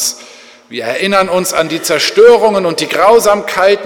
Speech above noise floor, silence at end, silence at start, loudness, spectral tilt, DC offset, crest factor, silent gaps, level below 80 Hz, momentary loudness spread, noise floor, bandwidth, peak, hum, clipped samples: 27 dB; 0 s; 0 s; -10 LUFS; -2.5 dB/octave; under 0.1%; 10 dB; none; -50 dBFS; 12 LU; -37 dBFS; 18.5 kHz; 0 dBFS; none; 0.2%